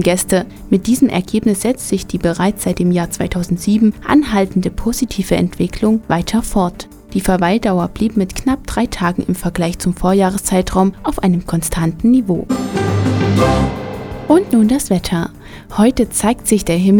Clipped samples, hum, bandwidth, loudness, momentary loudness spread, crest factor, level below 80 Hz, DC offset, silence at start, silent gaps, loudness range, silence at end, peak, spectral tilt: under 0.1%; none; 19 kHz; -16 LUFS; 6 LU; 14 dB; -32 dBFS; under 0.1%; 0 s; none; 2 LU; 0 s; 0 dBFS; -5.5 dB/octave